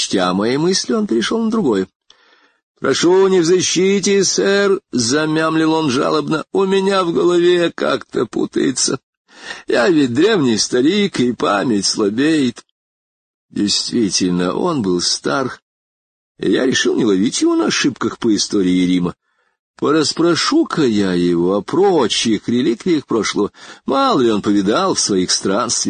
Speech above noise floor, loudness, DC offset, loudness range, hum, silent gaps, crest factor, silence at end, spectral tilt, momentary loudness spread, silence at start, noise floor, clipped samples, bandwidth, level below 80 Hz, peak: 38 dB; -15 LUFS; under 0.1%; 3 LU; none; 1.96-2.00 s, 2.63-2.74 s, 9.03-9.25 s, 12.71-13.49 s, 15.62-16.35 s, 19.59-19.74 s; 14 dB; 0 s; -4 dB/octave; 6 LU; 0 s; -54 dBFS; under 0.1%; 9.6 kHz; -52 dBFS; -2 dBFS